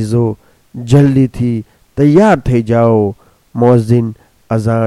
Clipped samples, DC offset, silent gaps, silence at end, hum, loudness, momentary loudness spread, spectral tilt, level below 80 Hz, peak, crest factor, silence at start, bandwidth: under 0.1%; under 0.1%; none; 0 s; none; -12 LUFS; 17 LU; -8.5 dB/octave; -36 dBFS; 0 dBFS; 12 dB; 0 s; 12 kHz